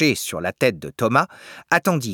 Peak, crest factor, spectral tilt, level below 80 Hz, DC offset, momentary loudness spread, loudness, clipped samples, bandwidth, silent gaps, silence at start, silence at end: -2 dBFS; 20 dB; -4.5 dB/octave; -60 dBFS; under 0.1%; 8 LU; -21 LUFS; under 0.1%; 19.5 kHz; none; 0 s; 0 s